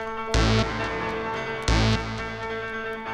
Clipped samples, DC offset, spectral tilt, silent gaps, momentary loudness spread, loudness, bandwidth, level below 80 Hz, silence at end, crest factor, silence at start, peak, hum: under 0.1%; under 0.1%; -5 dB/octave; none; 9 LU; -26 LUFS; 11 kHz; -32 dBFS; 0 s; 18 dB; 0 s; -8 dBFS; none